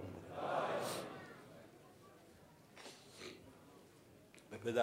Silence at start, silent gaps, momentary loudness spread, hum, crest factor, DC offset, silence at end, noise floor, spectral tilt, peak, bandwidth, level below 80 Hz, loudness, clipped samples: 0 s; none; 22 LU; none; 24 dB; under 0.1%; 0 s; -64 dBFS; -4.5 dB/octave; -22 dBFS; 16 kHz; -82 dBFS; -45 LUFS; under 0.1%